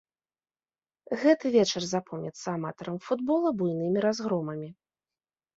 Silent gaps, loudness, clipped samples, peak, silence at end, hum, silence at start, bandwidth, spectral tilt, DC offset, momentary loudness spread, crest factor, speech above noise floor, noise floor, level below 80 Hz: none; -28 LUFS; under 0.1%; -8 dBFS; 0.85 s; none; 1.1 s; 8 kHz; -5.5 dB/octave; under 0.1%; 13 LU; 20 dB; over 62 dB; under -90 dBFS; -72 dBFS